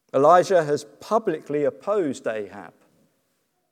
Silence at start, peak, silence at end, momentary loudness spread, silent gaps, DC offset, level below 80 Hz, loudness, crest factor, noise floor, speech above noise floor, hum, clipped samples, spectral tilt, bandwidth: 0.15 s; -2 dBFS; 1.05 s; 15 LU; none; under 0.1%; -80 dBFS; -22 LUFS; 20 dB; -72 dBFS; 50 dB; none; under 0.1%; -5.5 dB/octave; 14 kHz